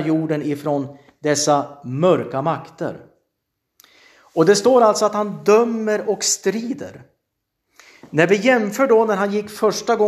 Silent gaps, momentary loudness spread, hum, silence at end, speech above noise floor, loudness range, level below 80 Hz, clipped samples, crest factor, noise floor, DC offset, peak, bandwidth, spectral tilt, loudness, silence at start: none; 13 LU; none; 0 s; 58 dB; 4 LU; -68 dBFS; under 0.1%; 18 dB; -76 dBFS; under 0.1%; 0 dBFS; 14.5 kHz; -4.5 dB/octave; -18 LUFS; 0 s